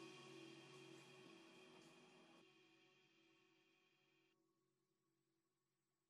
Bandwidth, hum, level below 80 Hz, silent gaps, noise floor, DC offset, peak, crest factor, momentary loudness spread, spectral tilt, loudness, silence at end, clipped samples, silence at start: 12 kHz; none; under -90 dBFS; none; under -90 dBFS; under 0.1%; -50 dBFS; 18 dB; 8 LU; -4 dB/octave; -64 LUFS; 0.6 s; under 0.1%; 0 s